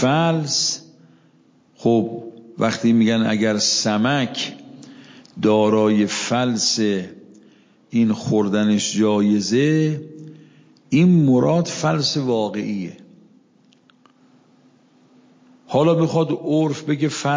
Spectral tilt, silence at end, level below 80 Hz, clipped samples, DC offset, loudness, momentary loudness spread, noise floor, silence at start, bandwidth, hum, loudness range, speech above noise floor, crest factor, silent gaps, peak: -5 dB/octave; 0 s; -62 dBFS; under 0.1%; under 0.1%; -19 LUFS; 11 LU; -56 dBFS; 0 s; 7.6 kHz; none; 7 LU; 38 dB; 14 dB; none; -6 dBFS